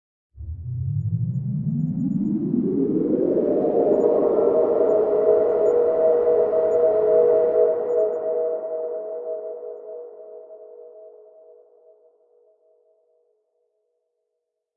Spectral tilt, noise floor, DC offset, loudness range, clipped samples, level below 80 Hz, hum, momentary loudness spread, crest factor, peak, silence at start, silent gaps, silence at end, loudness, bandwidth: -12 dB/octave; -79 dBFS; under 0.1%; 15 LU; under 0.1%; -54 dBFS; none; 17 LU; 16 dB; -6 dBFS; 0.35 s; none; 3.65 s; -21 LUFS; 2.9 kHz